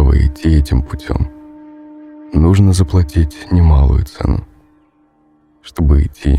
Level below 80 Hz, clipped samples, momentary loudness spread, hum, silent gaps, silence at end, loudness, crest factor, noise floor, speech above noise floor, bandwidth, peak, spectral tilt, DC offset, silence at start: -18 dBFS; under 0.1%; 10 LU; none; none; 0 s; -14 LUFS; 14 dB; -54 dBFS; 42 dB; 12 kHz; 0 dBFS; -8 dB/octave; under 0.1%; 0 s